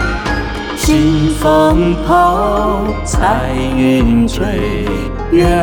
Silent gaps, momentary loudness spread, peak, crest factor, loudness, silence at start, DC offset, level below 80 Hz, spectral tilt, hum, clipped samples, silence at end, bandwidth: none; 7 LU; -2 dBFS; 10 dB; -13 LUFS; 0 s; under 0.1%; -20 dBFS; -6 dB/octave; none; under 0.1%; 0 s; over 20 kHz